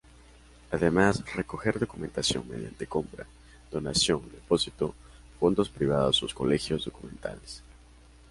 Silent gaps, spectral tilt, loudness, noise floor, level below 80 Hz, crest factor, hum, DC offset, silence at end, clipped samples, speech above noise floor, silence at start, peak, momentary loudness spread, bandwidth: none; -4.5 dB/octave; -29 LUFS; -54 dBFS; -50 dBFS; 20 dB; none; under 0.1%; 0.6 s; under 0.1%; 25 dB; 0.7 s; -10 dBFS; 15 LU; 11.5 kHz